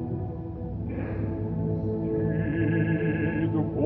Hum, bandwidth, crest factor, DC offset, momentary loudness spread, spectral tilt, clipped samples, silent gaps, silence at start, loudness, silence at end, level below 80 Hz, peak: none; 3.5 kHz; 14 dB; under 0.1%; 8 LU; -12 dB/octave; under 0.1%; none; 0 s; -28 LUFS; 0 s; -42 dBFS; -14 dBFS